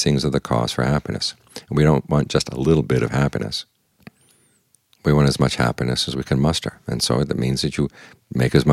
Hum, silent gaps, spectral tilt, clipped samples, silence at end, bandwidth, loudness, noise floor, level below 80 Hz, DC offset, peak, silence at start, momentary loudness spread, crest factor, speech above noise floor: none; none; -5.5 dB/octave; under 0.1%; 0 s; 14 kHz; -20 LUFS; -61 dBFS; -38 dBFS; under 0.1%; -2 dBFS; 0 s; 8 LU; 20 dB; 41 dB